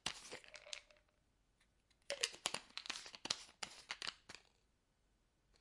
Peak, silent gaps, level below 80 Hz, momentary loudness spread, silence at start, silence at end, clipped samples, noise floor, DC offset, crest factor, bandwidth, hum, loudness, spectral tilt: -16 dBFS; none; -78 dBFS; 13 LU; 0.05 s; 0.05 s; under 0.1%; -80 dBFS; under 0.1%; 36 dB; 12 kHz; none; -46 LUFS; 0 dB/octave